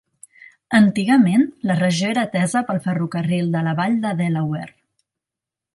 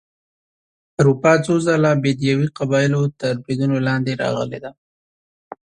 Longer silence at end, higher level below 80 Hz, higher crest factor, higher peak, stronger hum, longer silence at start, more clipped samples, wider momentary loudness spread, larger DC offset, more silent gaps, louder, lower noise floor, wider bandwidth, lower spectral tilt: first, 1.05 s vs 0.25 s; second, -62 dBFS vs -56 dBFS; about the same, 16 dB vs 18 dB; about the same, -2 dBFS vs 0 dBFS; neither; second, 0.7 s vs 1 s; neither; about the same, 8 LU vs 9 LU; neither; second, none vs 4.78-5.51 s; about the same, -19 LUFS vs -18 LUFS; about the same, -87 dBFS vs under -90 dBFS; first, 11.5 kHz vs 10 kHz; about the same, -6 dB/octave vs -6.5 dB/octave